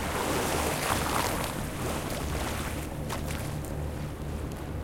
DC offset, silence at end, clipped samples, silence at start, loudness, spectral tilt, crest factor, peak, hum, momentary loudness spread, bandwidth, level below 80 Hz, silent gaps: under 0.1%; 0 s; under 0.1%; 0 s; -31 LUFS; -4 dB/octave; 18 dB; -12 dBFS; none; 8 LU; 17 kHz; -40 dBFS; none